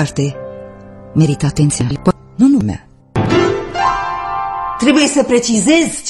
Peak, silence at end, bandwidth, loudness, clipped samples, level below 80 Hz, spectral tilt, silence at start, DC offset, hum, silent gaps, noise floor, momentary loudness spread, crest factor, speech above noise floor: 0 dBFS; 0 s; 12 kHz; -14 LUFS; under 0.1%; -38 dBFS; -5 dB/octave; 0 s; under 0.1%; none; none; -34 dBFS; 11 LU; 14 dB; 22 dB